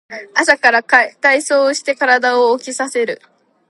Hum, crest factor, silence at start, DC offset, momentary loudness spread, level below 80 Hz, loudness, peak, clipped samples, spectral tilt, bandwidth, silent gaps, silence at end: none; 16 dB; 0.1 s; under 0.1%; 9 LU; -64 dBFS; -14 LUFS; 0 dBFS; under 0.1%; -1 dB/octave; 11.5 kHz; none; 0.55 s